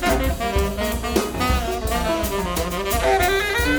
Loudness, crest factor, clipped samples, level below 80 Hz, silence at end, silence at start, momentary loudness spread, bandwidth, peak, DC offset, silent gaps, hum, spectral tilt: -21 LUFS; 16 dB; under 0.1%; -28 dBFS; 0 s; 0 s; 5 LU; over 20 kHz; -4 dBFS; under 0.1%; none; none; -4.5 dB/octave